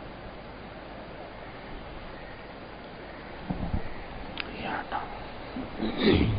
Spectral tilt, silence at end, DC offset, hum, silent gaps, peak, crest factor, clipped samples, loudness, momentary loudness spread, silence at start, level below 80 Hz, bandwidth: -10 dB/octave; 0 s; under 0.1%; none; none; -10 dBFS; 24 dB; under 0.1%; -35 LUFS; 10 LU; 0 s; -42 dBFS; 5.2 kHz